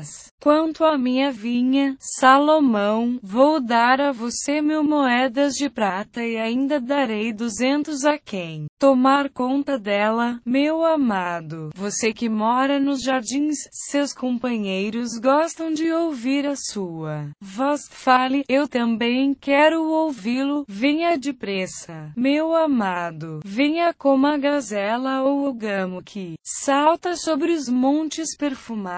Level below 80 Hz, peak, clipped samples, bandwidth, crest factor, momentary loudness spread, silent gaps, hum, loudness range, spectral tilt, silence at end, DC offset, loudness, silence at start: -62 dBFS; -2 dBFS; under 0.1%; 8 kHz; 18 dB; 10 LU; 0.31-0.38 s, 8.69-8.77 s; none; 4 LU; -4 dB/octave; 0 s; under 0.1%; -21 LUFS; 0 s